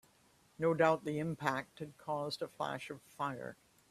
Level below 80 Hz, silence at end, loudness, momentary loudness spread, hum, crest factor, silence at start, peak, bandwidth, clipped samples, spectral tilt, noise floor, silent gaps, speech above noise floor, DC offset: -76 dBFS; 0.35 s; -37 LUFS; 16 LU; none; 24 dB; 0.6 s; -14 dBFS; 14 kHz; under 0.1%; -6 dB/octave; -69 dBFS; none; 32 dB; under 0.1%